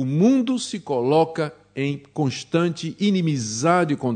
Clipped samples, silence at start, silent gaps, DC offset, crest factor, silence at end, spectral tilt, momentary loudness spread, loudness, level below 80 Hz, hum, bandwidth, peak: under 0.1%; 0 s; none; under 0.1%; 18 dB; 0 s; -6 dB/octave; 9 LU; -22 LUFS; -66 dBFS; none; 9.4 kHz; -4 dBFS